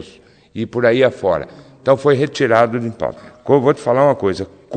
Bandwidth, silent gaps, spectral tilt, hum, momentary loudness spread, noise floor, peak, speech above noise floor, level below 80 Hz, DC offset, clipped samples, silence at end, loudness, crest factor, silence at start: 9.2 kHz; none; -6.5 dB/octave; none; 13 LU; -45 dBFS; 0 dBFS; 30 dB; -54 dBFS; under 0.1%; under 0.1%; 0 s; -16 LUFS; 16 dB; 0 s